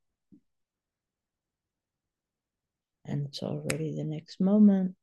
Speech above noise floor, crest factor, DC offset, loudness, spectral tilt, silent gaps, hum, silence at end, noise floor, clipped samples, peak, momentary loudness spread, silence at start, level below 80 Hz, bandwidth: 63 dB; 22 dB; under 0.1%; -28 LUFS; -7 dB/octave; none; none; 0.1 s; -90 dBFS; under 0.1%; -10 dBFS; 14 LU; 3.05 s; -72 dBFS; 12 kHz